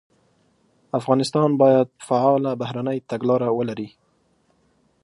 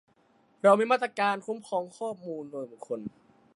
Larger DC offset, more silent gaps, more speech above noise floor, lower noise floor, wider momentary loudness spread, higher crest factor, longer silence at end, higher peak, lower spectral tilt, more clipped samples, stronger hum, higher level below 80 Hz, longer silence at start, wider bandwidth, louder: neither; neither; first, 44 dB vs 37 dB; about the same, -64 dBFS vs -65 dBFS; second, 11 LU vs 16 LU; about the same, 18 dB vs 22 dB; first, 1.15 s vs 0.45 s; first, -4 dBFS vs -8 dBFS; first, -7 dB/octave vs -5 dB/octave; neither; neither; first, -68 dBFS vs -78 dBFS; first, 0.95 s vs 0.65 s; about the same, 11.5 kHz vs 11 kHz; first, -21 LUFS vs -28 LUFS